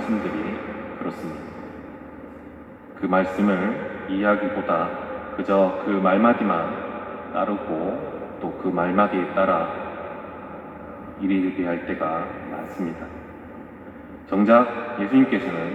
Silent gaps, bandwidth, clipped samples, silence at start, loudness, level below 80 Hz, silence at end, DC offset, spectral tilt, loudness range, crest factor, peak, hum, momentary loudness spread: none; 8.2 kHz; under 0.1%; 0 s; -23 LUFS; -56 dBFS; 0 s; under 0.1%; -8.5 dB/octave; 6 LU; 22 dB; -2 dBFS; none; 21 LU